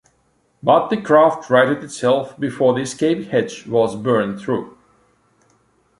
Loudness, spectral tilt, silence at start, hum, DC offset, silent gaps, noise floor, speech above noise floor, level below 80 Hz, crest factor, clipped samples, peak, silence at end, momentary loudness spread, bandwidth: -18 LUFS; -5.5 dB/octave; 0.65 s; none; under 0.1%; none; -62 dBFS; 45 dB; -60 dBFS; 18 dB; under 0.1%; 0 dBFS; 1.3 s; 10 LU; 11.5 kHz